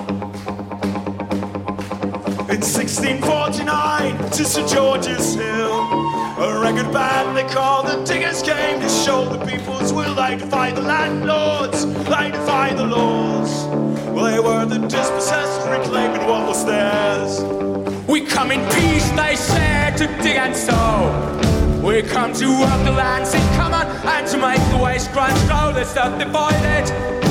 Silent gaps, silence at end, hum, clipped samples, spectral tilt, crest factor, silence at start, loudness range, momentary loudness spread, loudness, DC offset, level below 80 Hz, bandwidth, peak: none; 0 s; none; under 0.1%; -4.5 dB/octave; 14 dB; 0 s; 2 LU; 6 LU; -18 LUFS; under 0.1%; -32 dBFS; 16.5 kHz; -4 dBFS